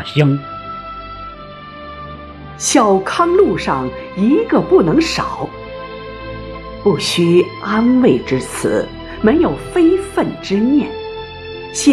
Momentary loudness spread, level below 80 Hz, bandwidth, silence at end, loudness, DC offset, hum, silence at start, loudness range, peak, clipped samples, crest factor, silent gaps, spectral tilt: 18 LU; -40 dBFS; 13.5 kHz; 0 s; -15 LUFS; under 0.1%; none; 0 s; 3 LU; 0 dBFS; under 0.1%; 16 dB; none; -5 dB/octave